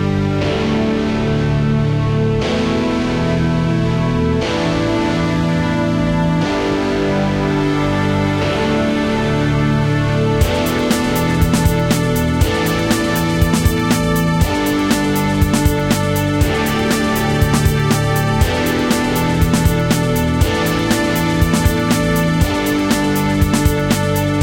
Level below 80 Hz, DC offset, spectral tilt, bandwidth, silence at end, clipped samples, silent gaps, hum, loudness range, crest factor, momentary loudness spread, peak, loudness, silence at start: -26 dBFS; under 0.1%; -5.5 dB/octave; 17 kHz; 0 s; under 0.1%; none; none; 1 LU; 14 dB; 2 LU; -2 dBFS; -16 LUFS; 0 s